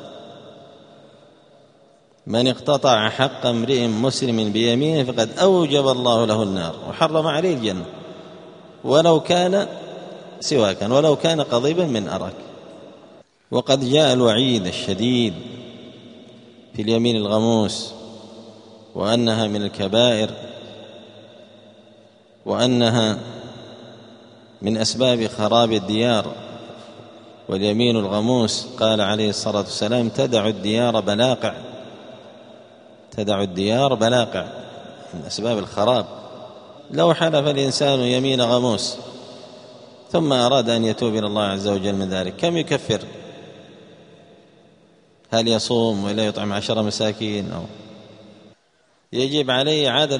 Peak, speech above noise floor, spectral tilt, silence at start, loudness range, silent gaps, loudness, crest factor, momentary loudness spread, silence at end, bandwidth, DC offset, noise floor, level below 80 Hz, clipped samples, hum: 0 dBFS; 42 dB; -5 dB/octave; 0 s; 5 LU; none; -20 LUFS; 20 dB; 21 LU; 0 s; 10.5 kHz; under 0.1%; -61 dBFS; -60 dBFS; under 0.1%; none